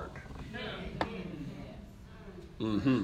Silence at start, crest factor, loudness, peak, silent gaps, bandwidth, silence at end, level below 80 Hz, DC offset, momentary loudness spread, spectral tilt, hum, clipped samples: 0 s; 22 dB; -38 LUFS; -16 dBFS; none; 12 kHz; 0 s; -52 dBFS; under 0.1%; 17 LU; -7 dB/octave; none; under 0.1%